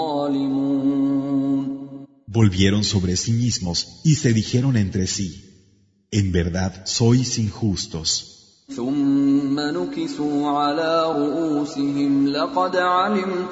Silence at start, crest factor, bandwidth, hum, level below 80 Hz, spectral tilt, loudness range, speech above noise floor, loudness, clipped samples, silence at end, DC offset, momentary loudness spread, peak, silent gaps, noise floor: 0 s; 18 dB; 8 kHz; none; -46 dBFS; -5.5 dB/octave; 2 LU; 38 dB; -21 LUFS; under 0.1%; 0 s; under 0.1%; 7 LU; -2 dBFS; none; -58 dBFS